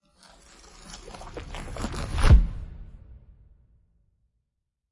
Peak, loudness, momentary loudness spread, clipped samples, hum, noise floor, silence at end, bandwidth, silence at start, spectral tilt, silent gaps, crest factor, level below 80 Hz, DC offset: -6 dBFS; -25 LUFS; 26 LU; under 0.1%; none; -81 dBFS; 1.95 s; 11.5 kHz; 0.85 s; -6 dB/octave; none; 20 dB; -28 dBFS; under 0.1%